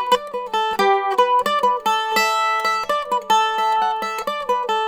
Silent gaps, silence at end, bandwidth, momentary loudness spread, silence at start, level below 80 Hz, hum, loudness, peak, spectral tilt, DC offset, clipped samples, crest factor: none; 0 s; over 20 kHz; 5 LU; 0 s; -60 dBFS; none; -19 LUFS; -4 dBFS; -1.5 dB/octave; under 0.1%; under 0.1%; 14 dB